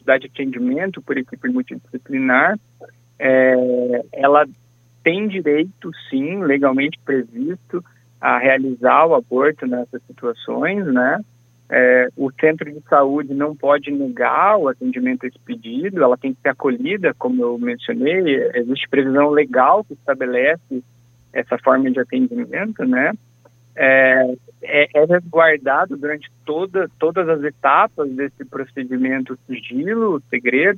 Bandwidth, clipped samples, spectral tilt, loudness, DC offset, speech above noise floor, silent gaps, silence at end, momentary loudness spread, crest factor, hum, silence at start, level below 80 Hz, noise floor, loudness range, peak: 6.6 kHz; under 0.1%; -7.5 dB/octave; -17 LUFS; under 0.1%; 34 dB; none; 0 s; 12 LU; 18 dB; none; 0.05 s; -70 dBFS; -51 dBFS; 4 LU; 0 dBFS